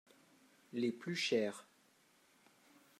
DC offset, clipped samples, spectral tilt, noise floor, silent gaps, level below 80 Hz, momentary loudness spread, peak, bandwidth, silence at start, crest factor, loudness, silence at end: under 0.1%; under 0.1%; -4.5 dB/octave; -71 dBFS; none; under -90 dBFS; 12 LU; -22 dBFS; 14.5 kHz; 0.75 s; 20 dB; -39 LUFS; 1.4 s